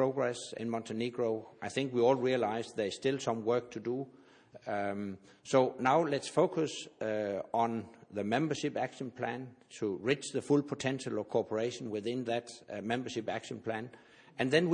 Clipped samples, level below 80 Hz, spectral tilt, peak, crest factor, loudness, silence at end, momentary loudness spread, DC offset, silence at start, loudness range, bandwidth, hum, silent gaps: under 0.1%; -76 dBFS; -5.5 dB/octave; -14 dBFS; 20 dB; -34 LUFS; 0 s; 11 LU; under 0.1%; 0 s; 4 LU; 10 kHz; none; none